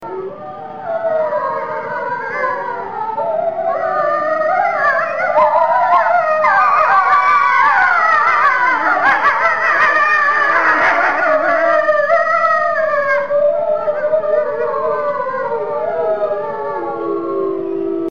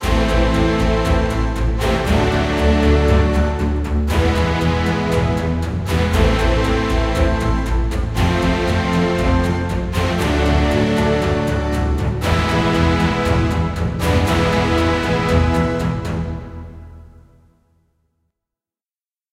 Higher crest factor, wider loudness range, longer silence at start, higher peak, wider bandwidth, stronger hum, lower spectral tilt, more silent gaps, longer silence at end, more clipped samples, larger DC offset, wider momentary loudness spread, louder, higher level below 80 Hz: about the same, 12 dB vs 16 dB; first, 8 LU vs 3 LU; about the same, 0 s vs 0 s; about the same, -2 dBFS vs -2 dBFS; second, 7.2 kHz vs 15 kHz; neither; second, -4.5 dB/octave vs -6.5 dB/octave; neither; second, 0 s vs 2.3 s; neither; first, 1% vs under 0.1%; first, 10 LU vs 5 LU; first, -14 LUFS vs -18 LUFS; second, -56 dBFS vs -22 dBFS